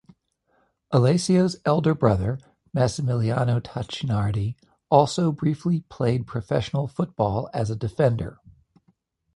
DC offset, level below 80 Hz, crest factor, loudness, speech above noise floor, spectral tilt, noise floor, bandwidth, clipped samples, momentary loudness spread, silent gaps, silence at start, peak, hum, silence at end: under 0.1%; -48 dBFS; 22 dB; -24 LUFS; 46 dB; -7 dB/octave; -68 dBFS; 11.5 kHz; under 0.1%; 10 LU; none; 0.9 s; -2 dBFS; none; 1 s